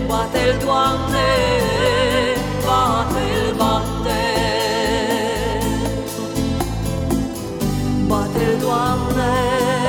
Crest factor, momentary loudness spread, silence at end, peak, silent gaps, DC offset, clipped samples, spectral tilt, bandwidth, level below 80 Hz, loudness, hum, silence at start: 14 dB; 6 LU; 0 s; -4 dBFS; none; under 0.1%; under 0.1%; -5 dB/octave; 18.5 kHz; -30 dBFS; -19 LUFS; none; 0 s